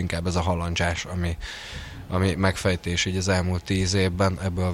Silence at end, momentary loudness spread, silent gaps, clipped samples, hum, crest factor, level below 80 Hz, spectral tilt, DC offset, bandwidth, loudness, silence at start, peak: 0 s; 10 LU; none; under 0.1%; none; 18 dB; -40 dBFS; -5 dB/octave; under 0.1%; 14 kHz; -25 LUFS; 0 s; -8 dBFS